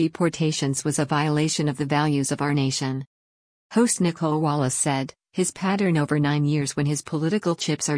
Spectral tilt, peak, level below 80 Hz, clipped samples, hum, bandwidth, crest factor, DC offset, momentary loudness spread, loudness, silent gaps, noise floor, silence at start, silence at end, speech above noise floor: -5 dB/octave; -8 dBFS; -60 dBFS; under 0.1%; none; 10.5 kHz; 16 dB; under 0.1%; 5 LU; -23 LUFS; 3.07-3.70 s; under -90 dBFS; 0 s; 0 s; over 67 dB